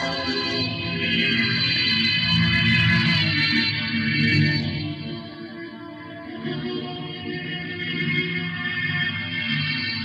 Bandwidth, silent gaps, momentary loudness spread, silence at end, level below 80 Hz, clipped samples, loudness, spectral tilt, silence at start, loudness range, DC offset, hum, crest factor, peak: 9 kHz; none; 16 LU; 0 s; -50 dBFS; under 0.1%; -21 LUFS; -5.5 dB/octave; 0 s; 10 LU; under 0.1%; none; 14 dB; -10 dBFS